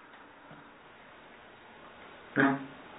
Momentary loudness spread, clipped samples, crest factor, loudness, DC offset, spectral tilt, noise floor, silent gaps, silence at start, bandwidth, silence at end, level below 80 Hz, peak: 25 LU; under 0.1%; 26 dB; -30 LUFS; under 0.1%; -1.5 dB/octave; -54 dBFS; none; 0.15 s; 3.9 kHz; 0 s; -74 dBFS; -10 dBFS